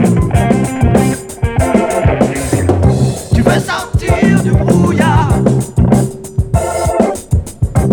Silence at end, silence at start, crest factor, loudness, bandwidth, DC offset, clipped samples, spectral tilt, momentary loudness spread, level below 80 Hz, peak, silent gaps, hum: 0 s; 0 s; 12 dB; -12 LUFS; 20 kHz; under 0.1%; 0.2%; -6.5 dB/octave; 6 LU; -22 dBFS; 0 dBFS; none; none